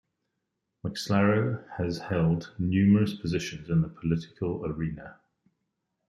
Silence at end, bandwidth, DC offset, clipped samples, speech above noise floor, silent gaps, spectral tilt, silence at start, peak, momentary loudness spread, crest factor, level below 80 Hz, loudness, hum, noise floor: 0.95 s; 12.5 kHz; under 0.1%; under 0.1%; 55 dB; none; -7 dB/octave; 0.85 s; -10 dBFS; 12 LU; 18 dB; -54 dBFS; -28 LUFS; none; -82 dBFS